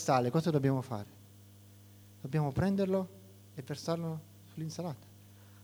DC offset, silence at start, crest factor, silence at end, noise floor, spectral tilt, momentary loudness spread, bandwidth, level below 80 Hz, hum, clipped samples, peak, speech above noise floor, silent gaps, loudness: under 0.1%; 0 s; 22 dB; 0 s; -56 dBFS; -7 dB/octave; 19 LU; over 20 kHz; -62 dBFS; 50 Hz at -55 dBFS; under 0.1%; -14 dBFS; 24 dB; none; -34 LUFS